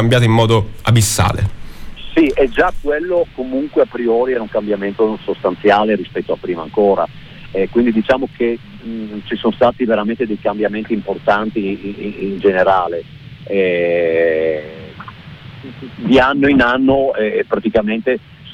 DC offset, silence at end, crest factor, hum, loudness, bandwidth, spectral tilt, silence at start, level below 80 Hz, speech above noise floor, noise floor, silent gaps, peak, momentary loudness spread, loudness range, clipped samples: under 0.1%; 0 s; 14 dB; none; -16 LUFS; 17 kHz; -5.5 dB/octave; 0 s; -36 dBFS; 19 dB; -35 dBFS; none; -2 dBFS; 14 LU; 3 LU; under 0.1%